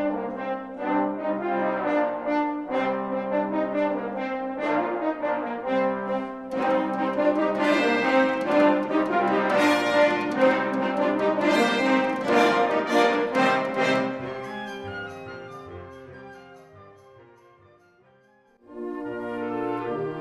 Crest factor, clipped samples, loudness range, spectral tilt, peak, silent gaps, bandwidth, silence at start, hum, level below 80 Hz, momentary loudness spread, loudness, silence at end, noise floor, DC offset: 18 dB; under 0.1%; 16 LU; -5.5 dB/octave; -8 dBFS; none; 13.5 kHz; 0 s; none; -64 dBFS; 13 LU; -24 LUFS; 0 s; -59 dBFS; under 0.1%